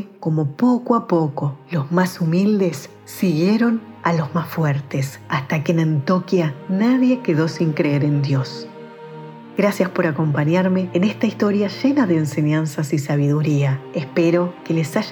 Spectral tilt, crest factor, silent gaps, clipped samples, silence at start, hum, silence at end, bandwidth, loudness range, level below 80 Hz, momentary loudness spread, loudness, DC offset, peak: -7.5 dB/octave; 16 dB; none; under 0.1%; 0 s; none; 0 s; 19.5 kHz; 2 LU; -70 dBFS; 8 LU; -19 LUFS; under 0.1%; -2 dBFS